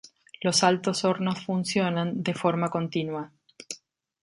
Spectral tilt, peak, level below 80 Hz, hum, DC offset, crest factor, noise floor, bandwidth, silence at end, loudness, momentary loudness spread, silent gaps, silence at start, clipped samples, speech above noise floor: -4.5 dB/octave; -6 dBFS; -70 dBFS; none; under 0.1%; 20 dB; -53 dBFS; 11.5 kHz; 0.45 s; -26 LUFS; 18 LU; none; 0.4 s; under 0.1%; 27 dB